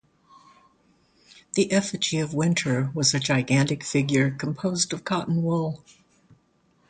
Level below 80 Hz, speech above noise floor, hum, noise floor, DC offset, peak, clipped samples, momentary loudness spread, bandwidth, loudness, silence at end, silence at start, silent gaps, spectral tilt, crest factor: -60 dBFS; 41 dB; none; -64 dBFS; under 0.1%; -8 dBFS; under 0.1%; 6 LU; 9.6 kHz; -24 LUFS; 1.15 s; 1.55 s; none; -4.5 dB/octave; 18 dB